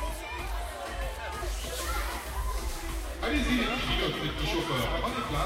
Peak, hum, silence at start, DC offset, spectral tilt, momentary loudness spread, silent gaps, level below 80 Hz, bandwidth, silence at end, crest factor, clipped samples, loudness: -16 dBFS; none; 0 s; under 0.1%; -4 dB/octave; 9 LU; none; -36 dBFS; 16 kHz; 0 s; 16 dB; under 0.1%; -32 LUFS